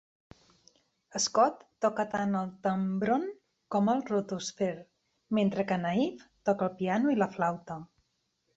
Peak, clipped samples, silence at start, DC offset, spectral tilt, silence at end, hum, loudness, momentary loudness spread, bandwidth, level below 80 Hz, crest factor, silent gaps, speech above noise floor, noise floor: -12 dBFS; under 0.1%; 1.15 s; under 0.1%; -5 dB/octave; 0.7 s; none; -30 LUFS; 8 LU; 8.2 kHz; -70 dBFS; 20 dB; none; 48 dB; -77 dBFS